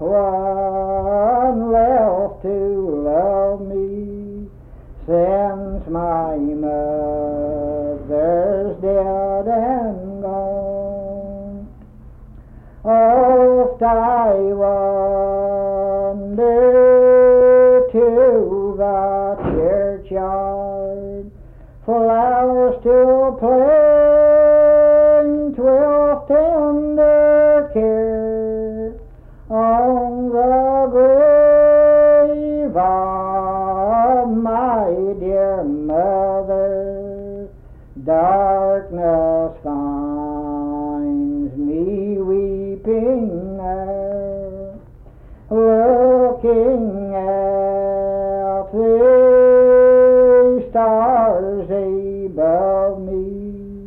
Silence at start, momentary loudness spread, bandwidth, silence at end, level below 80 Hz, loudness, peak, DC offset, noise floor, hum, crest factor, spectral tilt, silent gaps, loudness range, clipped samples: 0 s; 14 LU; 3.1 kHz; 0 s; -38 dBFS; -15 LUFS; -4 dBFS; under 0.1%; -40 dBFS; none; 10 dB; -11 dB/octave; none; 9 LU; under 0.1%